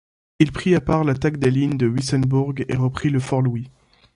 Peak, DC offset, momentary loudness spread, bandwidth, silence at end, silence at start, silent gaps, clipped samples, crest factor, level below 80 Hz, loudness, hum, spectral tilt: -2 dBFS; under 0.1%; 5 LU; 11.5 kHz; 0.45 s; 0.4 s; none; under 0.1%; 18 dB; -44 dBFS; -20 LUFS; none; -7 dB/octave